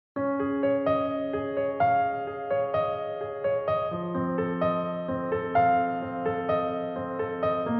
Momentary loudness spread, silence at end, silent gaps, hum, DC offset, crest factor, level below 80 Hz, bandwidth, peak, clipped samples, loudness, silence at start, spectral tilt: 7 LU; 0 s; none; none; under 0.1%; 14 dB; -60 dBFS; 5.4 kHz; -12 dBFS; under 0.1%; -28 LUFS; 0.15 s; -6 dB/octave